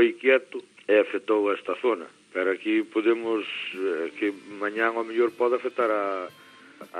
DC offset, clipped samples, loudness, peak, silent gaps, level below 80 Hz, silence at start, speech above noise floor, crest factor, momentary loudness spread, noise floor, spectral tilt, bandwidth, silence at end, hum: under 0.1%; under 0.1%; -26 LUFS; -8 dBFS; none; -88 dBFS; 0 s; 22 dB; 18 dB; 10 LU; -48 dBFS; -4.5 dB/octave; 10 kHz; 0 s; none